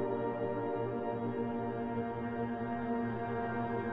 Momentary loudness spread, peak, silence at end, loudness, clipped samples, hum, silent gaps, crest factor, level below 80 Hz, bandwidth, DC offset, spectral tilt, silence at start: 2 LU; -22 dBFS; 0 s; -37 LUFS; under 0.1%; none; none; 14 dB; -62 dBFS; 4.9 kHz; under 0.1%; -10 dB/octave; 0 s